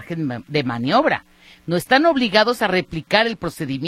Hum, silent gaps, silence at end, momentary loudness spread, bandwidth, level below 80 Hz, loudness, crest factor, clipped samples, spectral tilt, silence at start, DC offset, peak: none; none; 0 s; 10 LU; 15 kHz; -52 dBFS; -19 LUFS; 18 dB; under 0.1%; -5 dB/octave; 0 s; under 0.1%; -2 dBFS